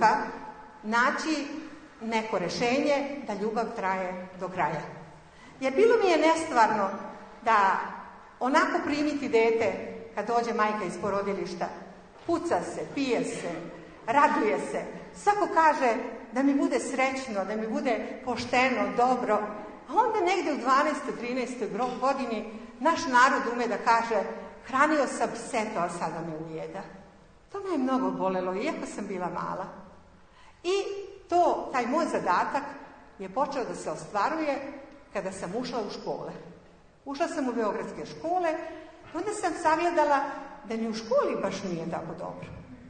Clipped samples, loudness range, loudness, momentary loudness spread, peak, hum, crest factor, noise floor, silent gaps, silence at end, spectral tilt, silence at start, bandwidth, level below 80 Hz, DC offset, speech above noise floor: under 0.1%; 7 LU; -28 LUFS; 16 LU; -6 dBFS; none; 22 dB; -55 dBFS; none; 0 s; -4.5 dB/octave; 0 s; 9.6 kHz; -62 dBFS; under 0.1%; 27 dB